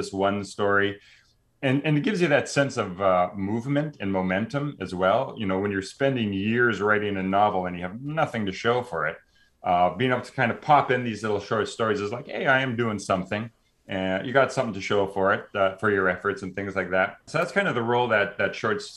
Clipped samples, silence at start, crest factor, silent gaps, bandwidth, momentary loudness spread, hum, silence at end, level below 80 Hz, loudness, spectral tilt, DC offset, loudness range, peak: under 0.1%; 0 s; 18 dB; none; 12 kHz; 7 LU; none; 0 s; -62 dBFS; -25 LUFS; -5.5 dB/octave; under 0.1%; 2 LU; -6 dBFS